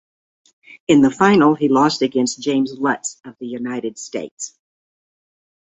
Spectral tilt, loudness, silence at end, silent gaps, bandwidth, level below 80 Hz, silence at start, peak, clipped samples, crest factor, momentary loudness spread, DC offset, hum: -5 dB/octave; -17 LUFS; 1.2 s; 4.31-4.37 s; 8.2 kHz; -60 dBFS; 0.9 s; -2 dBFS; under 0.1%; 18 dB; 17 LU; under 0.1%; none